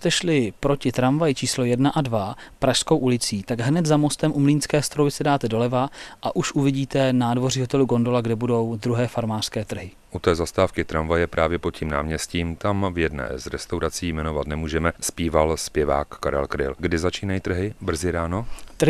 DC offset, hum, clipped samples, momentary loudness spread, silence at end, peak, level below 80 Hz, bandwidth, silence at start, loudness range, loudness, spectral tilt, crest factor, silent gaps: under 0.1%; none; under 0.1%; 7 LU; 0 s; -4 dBFS; -42 dBFS; 13 kHz; 0 s; 4 LU; -23 LUFS; -5 dB/octave; 18 dB; none